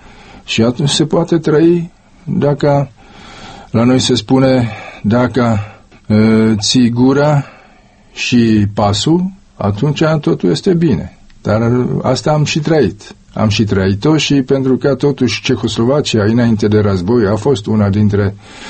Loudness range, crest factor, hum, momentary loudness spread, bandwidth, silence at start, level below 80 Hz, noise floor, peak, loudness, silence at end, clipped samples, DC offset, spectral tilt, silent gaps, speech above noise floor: 2 LU; 12 dB; none; 9 LU; 8.8 kHz; 0.35 s; -40 dBFS; -44 dBFS; 0 dBFS; -13 LUFS; 0 s; under 0.1%; under 0.1%; -6 dB/octave; none; 32 dB